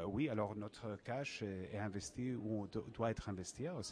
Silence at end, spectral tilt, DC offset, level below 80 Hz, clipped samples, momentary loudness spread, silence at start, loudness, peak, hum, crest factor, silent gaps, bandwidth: 0 s; -5.5 dB/octave; under 0.1%; -64 dBFS; under 0.1%; 7 LU; 0 s; -44 LUFS; -26 dBFS; none; 18 dB; none; 11 kHz